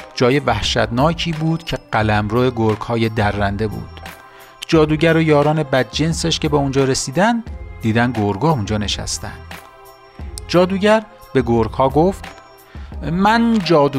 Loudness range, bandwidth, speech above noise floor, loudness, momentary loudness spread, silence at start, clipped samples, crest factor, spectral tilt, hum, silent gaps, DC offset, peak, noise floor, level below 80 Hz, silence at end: 3 LU; 15.5 kHz; 26 dB; -17 LUFS; 18 LU; 0 s; under 0.1%; 14 dB; -5.5 dB/octave; none; none; under 0.1%; -2 dBFS; -42 dBFS; -36 dBFS; 0 s